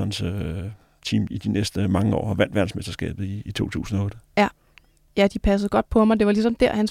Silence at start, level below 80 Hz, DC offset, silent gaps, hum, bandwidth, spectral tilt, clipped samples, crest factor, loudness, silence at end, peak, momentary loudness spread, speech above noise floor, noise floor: 0 s; -40 dBFS; under 0.1%; none; none; 14.5 kHz; -6.5 dB/octave; under 0.1%; 18 dB; -23 LUFS; 0 s; -4 dBFS; 11 LU; 34 dB; -56 dBFS